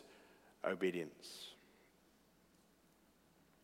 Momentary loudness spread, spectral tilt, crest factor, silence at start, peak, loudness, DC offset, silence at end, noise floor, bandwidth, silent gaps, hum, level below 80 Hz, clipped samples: 24 LU; -5 dB/octave; 24 dB; 0 s; -24 dBFS; -44 LUFS; under 0.1%; 2.1 s; -72 dBFS; 16 kHz; none; none; -84 dBFS; under 0.1%